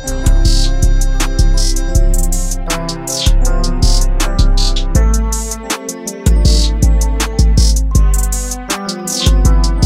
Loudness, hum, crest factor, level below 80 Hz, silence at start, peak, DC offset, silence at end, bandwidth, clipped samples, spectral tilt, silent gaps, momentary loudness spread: -15 LUFS; none; 10 dB; -12 dBFS; 0 s; 0 dBFS; under 0.1%; 0 s; 16 kHz; under 0.1%; -4 dB/octave; none; 7 LU